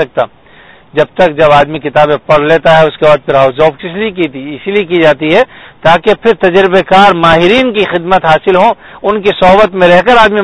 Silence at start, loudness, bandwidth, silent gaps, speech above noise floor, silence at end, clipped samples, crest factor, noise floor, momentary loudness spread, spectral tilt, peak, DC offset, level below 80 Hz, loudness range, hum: 0 s; -8 LUFS; 11 kHz; none; 31 dB; 0 s; 3%; 8 dB; -38 dBFS; 9 LU; -6 dB/octave; 0 dBFS; under 0.1%; -36 dBFS; 3 LU; none